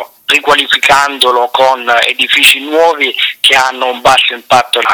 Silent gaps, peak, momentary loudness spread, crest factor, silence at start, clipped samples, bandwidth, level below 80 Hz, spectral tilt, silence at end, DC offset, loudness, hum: none; 0 dBFS; 5 LU; 10 dB; 0 s; 0.4%; over 20 kHz; -48 dBFS; -0.5 dB/octave; 0 s; under 0.1%; -8 LUFS; none